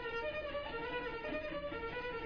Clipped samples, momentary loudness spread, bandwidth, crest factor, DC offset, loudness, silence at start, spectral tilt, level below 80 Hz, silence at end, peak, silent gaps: under 0.1%; 2 LU; 5.4 kHz; 12 dB; under 0.1%; -41 LUFS; 0 s; -2.5 dB/octave; -56 dBFS; 0 s; -28 dBFS; none